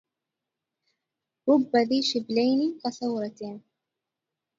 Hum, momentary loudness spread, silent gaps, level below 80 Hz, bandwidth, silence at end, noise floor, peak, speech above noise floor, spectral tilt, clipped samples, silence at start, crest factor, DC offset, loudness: none; 16 LU; none; -78 dBFS; 7.8 kHz; 1 s; -87 dBFS; -10 dBFS; 62 dB; -4.5 dB/octave; under 0.1%; 1.45 s; 18 dB; under 0.1%; -25 LUFS